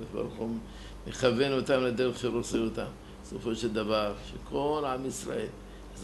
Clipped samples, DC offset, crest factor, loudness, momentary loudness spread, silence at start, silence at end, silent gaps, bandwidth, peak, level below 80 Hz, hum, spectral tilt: under 0.1%; under 0.1%; 18 dB; -31 LUFS; 15 LU; 0 s; 0 s; none; 12 kHz; -12 dBFS; -50 dBFS; none; -5 dB/octave